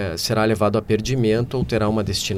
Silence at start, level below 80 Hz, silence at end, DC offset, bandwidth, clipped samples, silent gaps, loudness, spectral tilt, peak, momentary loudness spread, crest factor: 0 s; -40 dBFS; 0 s; under 0.1%; 16 kHz; under 0.1%; none; -20 LUFS; -5.5 dB/octave; -6 dBFS; 3 LU; 14 dB